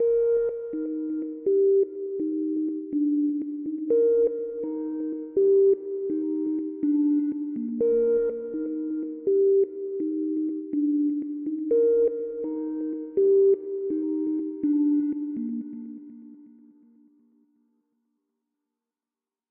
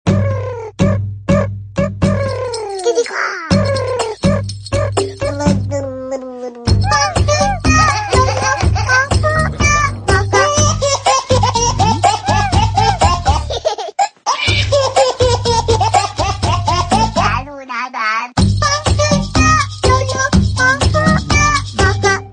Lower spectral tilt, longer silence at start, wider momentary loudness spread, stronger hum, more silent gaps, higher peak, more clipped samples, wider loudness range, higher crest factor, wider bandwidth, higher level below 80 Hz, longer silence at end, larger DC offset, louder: first, -11.5 dB/octave vs -4.5 dB/octave; about the same, 0 s vs 0.05 s; about the same, 10 LU vs 8 LU; neither; neither; second, -14 dBFS vs 0 dBFS; neither; about the same, 5 LU vs 4 LU; about the same, 12 dB vs 14 dB; second, 2 kHz vs 10 kHz; second, -66 dBFS vs -24 dBFS; first, 3.05 s vs 0 s; neither; second, -25 LUFS vs -14 LUFS